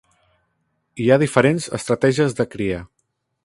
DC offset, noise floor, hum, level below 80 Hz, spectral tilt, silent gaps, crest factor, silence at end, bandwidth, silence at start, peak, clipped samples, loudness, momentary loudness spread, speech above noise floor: under 0.1%; -70 dBFS; none; -50 dBFS; -6 dB/octave; none; 20 dB; 0.6 s; 11.5 kHz; 0.95 s; 0 dBFS; under 0.1%; -19 LUFS; 10 LU; 52 dB